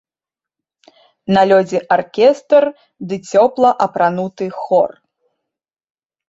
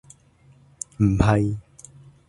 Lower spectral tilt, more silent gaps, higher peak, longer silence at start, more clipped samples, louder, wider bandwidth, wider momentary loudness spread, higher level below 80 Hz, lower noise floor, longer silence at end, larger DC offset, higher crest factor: about the same, -6 dB/octave vs -7 dB/octave; neither; about the same, 0 dBFS vs -2 dBFS; first, 1.3 s vs 1 s; neither; first, -15 LUFS vs -21 LUFS; second, 7.8 kHz vs 11 kHz; second, 13 LU vs 18 LU; second, -60 dBFS vs -38 dBFS; first, -89 dBFS vs -55 dBFS; first, 1.4 s vs 0.7 s; neither; second, 16 dB vs 24 dB